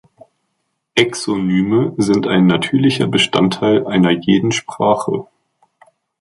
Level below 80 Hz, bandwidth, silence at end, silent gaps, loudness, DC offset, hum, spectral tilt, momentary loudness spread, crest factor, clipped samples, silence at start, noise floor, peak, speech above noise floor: -52 dBFS; 11.5 kHz; 1 s; none; -15 LUFS; under 0.1%; none; -5.5 dB/octave; 5 LU; 16 dB; under 0.1%; 0.95 s; -71 dBFS; 0 dBFS; 56 dB